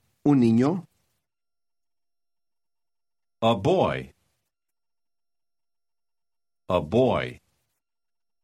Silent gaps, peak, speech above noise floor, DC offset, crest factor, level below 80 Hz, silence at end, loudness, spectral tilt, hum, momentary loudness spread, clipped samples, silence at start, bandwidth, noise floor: none; -8 dBFS; over 68 dB; under 0.1%; 20 dB; -58 dBFS; 1.1 s; -23 LUFS; -7.5 dB/octave; none; 11 LU; under 0.1%; 0.25 s; 11 kHz; under -90 dBFS